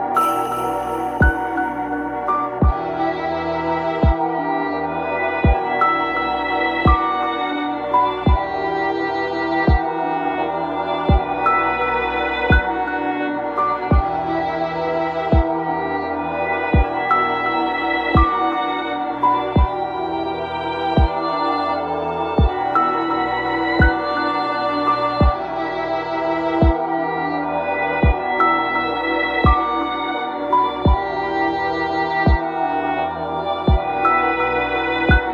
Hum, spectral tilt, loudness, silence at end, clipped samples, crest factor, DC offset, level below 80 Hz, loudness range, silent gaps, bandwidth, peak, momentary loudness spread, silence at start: none; -7.5 dB/octave; -19 LUFS; 0 s; under 0.1%; 16 dB; under 0.1%; -26 dBFS; 2 LU; none; 14 kHz; -2 dBFS; 6 LU; 0 s